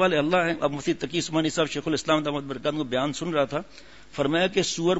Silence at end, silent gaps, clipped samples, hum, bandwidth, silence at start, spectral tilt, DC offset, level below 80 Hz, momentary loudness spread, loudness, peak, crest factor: 0 s; none; under 0.1%; none; 8 kHz; 0 s; -4.5 dB/octave; 0.4%; -56 dBFS; 6 LU; -25 LUFS; -8 dBFS; 16 dB